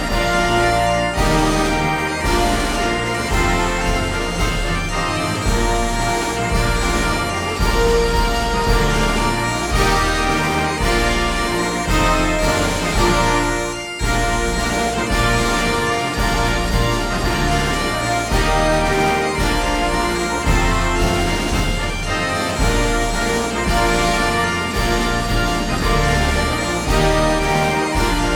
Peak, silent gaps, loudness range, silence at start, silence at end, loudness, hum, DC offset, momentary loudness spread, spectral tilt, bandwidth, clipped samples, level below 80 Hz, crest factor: -2 dBFS; none; 2 LU; 0 s; 0 s; -18 LUFS; none; under 0.1%; 3 LU; -4 dB/octave; 19 kHz; under 0.1%; -24 dBFS; 14 dB